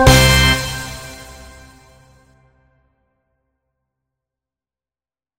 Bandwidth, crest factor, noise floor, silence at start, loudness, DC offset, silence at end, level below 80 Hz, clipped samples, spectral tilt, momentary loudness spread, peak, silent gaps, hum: 16.5 kHz; 20 dB; under -90 dBFS; 0 s; -13 LUFS; under 0.1%; 4.15 s; -26 dBFS; under 0.1%; -3.5 dB/octave; 26 LU; 0 dBFS; none; none